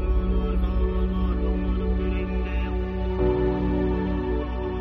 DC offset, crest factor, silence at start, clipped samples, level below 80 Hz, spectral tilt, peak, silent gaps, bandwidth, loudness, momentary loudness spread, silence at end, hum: under 0.1%; 12 dB; 0 s; under 0.1%; -26 dBFS; -10 dB/octave; -12 dBFS; none; 4.7 kHz; -26 LUFS; 4 LU; 0 s; none